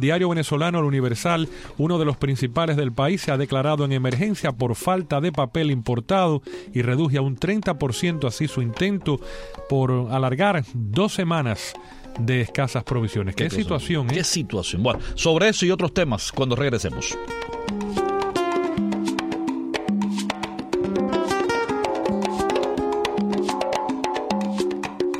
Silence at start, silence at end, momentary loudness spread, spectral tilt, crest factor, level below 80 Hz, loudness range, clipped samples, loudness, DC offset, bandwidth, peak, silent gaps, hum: 0 s; 0 s; 6 LU; -5.5 dB/octave; 16 dB; -44 dBFS; 3 LU; under 0.1%; -23 LUFS; under 0.1%; 15 kHz; -6 dBFS; none; none